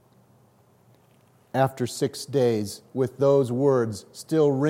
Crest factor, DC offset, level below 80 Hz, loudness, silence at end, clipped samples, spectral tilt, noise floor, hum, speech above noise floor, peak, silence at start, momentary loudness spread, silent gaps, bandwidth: 16 dB; under 0.1%; -72 dBFS; -24 LUFS; 0 s; under 0.1%; -6.5 dB/octave; -59 dBFS; none; 36 dB; -8 dBFS; 1.55 s; 10 LU; none; 16.5 kHz